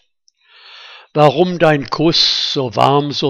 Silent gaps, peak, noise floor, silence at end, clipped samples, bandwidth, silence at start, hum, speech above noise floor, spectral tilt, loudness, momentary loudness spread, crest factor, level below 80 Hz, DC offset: none; 0 dBFS; -58 dBFS; 0 s; under 0.1%; 10.5 kHz; 0.75 s; none; 45 dB; -5 dB/octave; -13 LUFS; 4 LU; 16 dB; -48 dBFS; under 0.1%